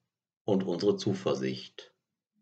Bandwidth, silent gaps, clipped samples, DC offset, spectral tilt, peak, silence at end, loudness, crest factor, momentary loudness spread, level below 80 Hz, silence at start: 8.2 kHz; none; under 0.1%; under 0.1%; -6.5 dB/octave; -14 dBFS; 0.55 s; -31 LUFS; 20 dB; 15 LU; -80 dBFS; 0.45 s